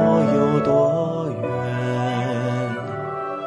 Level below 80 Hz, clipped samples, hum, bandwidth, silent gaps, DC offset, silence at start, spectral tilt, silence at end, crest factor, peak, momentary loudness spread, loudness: -56 dBFS; under 0.1%; none; 11.5 kHz; none; under 0.1%; 0 s; -8 dB/octave; 0 s; 14 dB; -6 dBFS; 10 LU; -21 LUFS